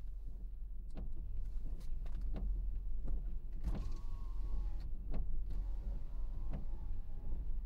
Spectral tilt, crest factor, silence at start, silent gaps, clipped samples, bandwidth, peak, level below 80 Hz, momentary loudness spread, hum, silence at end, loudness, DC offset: -8.5 dB/octave; 12 dB; 0 s; none; under 0.1%; 2.8 kHz; -26 dBFS; -40 dBFS; 6 LU; none; 0 s; -47 LUFS; under 0.1%